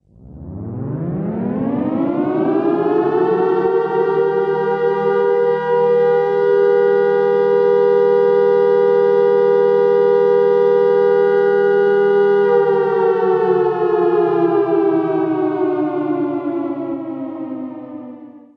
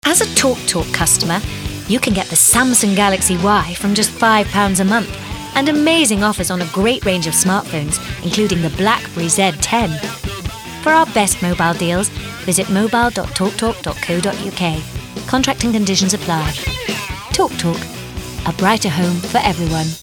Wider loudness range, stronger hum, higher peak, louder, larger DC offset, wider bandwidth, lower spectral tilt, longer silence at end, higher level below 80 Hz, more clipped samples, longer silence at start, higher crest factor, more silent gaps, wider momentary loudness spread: about the same, 5 LU vs 5 LU; neither; second, -4 dBFS vs 0 dBFS; about the same, -15 LUFS vs -15 LUFS; neither; second, 5.4 kHz vs 18 kHz; first, -9 dB/octave vs -3.5 dB/octave; first, 0.2 s vs 0 s; second, -56 dBFS vs -34 dBFS; neither; first, 0.3 s vs 0.05 s; about the same, 12 dB vs 16 dB; neither; about the same, 11 LU vs 11 LU